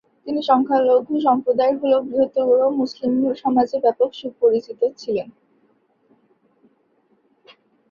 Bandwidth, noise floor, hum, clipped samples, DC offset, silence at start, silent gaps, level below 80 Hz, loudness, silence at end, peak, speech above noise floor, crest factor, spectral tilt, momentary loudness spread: 7 kHz; -63 dBFS; none; under 0.1%; under 0.1%; 0.25 s; none; -66 dBFS; -19 LUFS; 2.6 s; -2 dBFS; 44 dB; 18 dB; -6.5 dB/octave; 8 LU